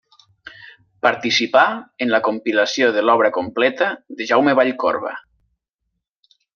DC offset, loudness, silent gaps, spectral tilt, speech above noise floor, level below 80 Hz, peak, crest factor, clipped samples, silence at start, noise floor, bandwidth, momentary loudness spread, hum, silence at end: under 0.1%; -18 LUFS; none; -3.5 dB/octave; 59 dB; -68 dBFS; -2 dBFS; 18 dB; under 0.1%; 0.45 s; -76 dBFS; 7 kHz; 8 LU; none; 1.35 s